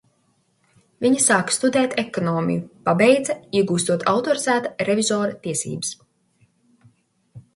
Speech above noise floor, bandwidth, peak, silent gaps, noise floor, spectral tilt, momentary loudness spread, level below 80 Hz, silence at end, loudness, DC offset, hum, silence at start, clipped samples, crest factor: 45 dB; 11.5 kHz; -2 dBFS; none; -65 dBFS; -4 dB/octave; 9 LU; -64 dBFS; 0.15 s; -20 LUFS; under 0.1%; none; 1 s; under 0.1%; 20 dB